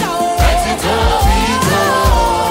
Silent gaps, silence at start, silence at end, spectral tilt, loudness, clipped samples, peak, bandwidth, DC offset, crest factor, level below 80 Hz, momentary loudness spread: none; 0 s; 0 s; -4.5 dB/octave; -13 LUFS; under 0.1%; 0 dBFS; 16.5 kHz; under 0.1%; 12 dB; -18 dBFS; 3 LU